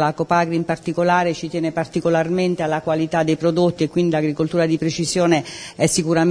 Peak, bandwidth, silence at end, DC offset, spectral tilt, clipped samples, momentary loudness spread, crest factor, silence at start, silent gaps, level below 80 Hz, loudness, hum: -2 dBFS; 11 kHz; 0 s; under 0.1%; -5.5 dB/octave; under 0.1%; 5 LU; 18 dB; 0 s; none; -52 dBFS; -19 LUFS; none